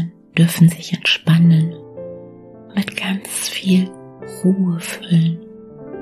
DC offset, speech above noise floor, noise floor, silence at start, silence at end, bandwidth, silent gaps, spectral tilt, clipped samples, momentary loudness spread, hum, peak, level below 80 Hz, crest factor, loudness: under 0.1%; 24 dB; -39 dBFS; 0 s; 0 s; 13.5 kHz; none; -5.5 dB/octave; under 0.1%; 21 LU; none; -2 dBFS; -60 dBFS; 16 dB; -17 LUFS